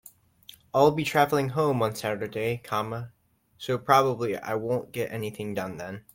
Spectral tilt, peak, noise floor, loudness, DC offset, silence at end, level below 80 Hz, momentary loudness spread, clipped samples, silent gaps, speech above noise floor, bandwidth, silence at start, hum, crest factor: -5.5 dB/octave; -4 dBFS; -53 dBFS; -27 LUFS; under 0.1%; 0.15 s; -64 dBFS; 13 LU; under 0.1%; none; 27 dB; 16.5 kHz; 0.75 s; none; 22 dB